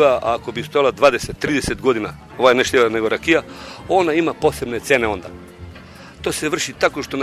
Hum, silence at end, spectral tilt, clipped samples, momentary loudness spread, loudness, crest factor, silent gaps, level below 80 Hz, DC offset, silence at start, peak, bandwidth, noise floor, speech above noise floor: none; 0 s; -4 dB/octave; under 0.1%; 19 LU; -18 LUFS; 18 dB; none; -44 dBFS; under 0.1%; 0 s; 0 dBFS; 13.5 kHz; -39 dBFS; 21 dB